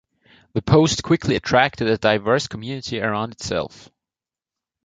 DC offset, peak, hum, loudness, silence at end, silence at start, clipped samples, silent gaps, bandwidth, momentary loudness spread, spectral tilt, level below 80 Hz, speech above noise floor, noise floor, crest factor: under 0.1%; -2 dBFS; none; -20 LUFS; 1.2 s; 0.55 s; under 0.1%; none; 9.4 kHz; 12 LU; -5 dB/octave; -46 dBFS; over 70 dB; under -90 dBFS; 20 dB